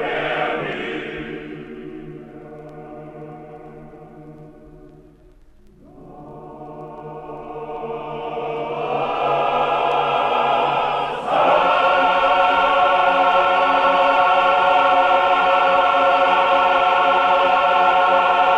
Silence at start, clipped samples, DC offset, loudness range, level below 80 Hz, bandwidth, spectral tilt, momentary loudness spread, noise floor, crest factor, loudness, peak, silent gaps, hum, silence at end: 0 s; under 0.1%; under 0.1%; 21 LU; -52 dBFS; 8.8 kHz; -4.5 dB/octave; 22 LU; -48 dBFS; 14 dB; -17 LUFS; -4 dBFS; none; none; 0 s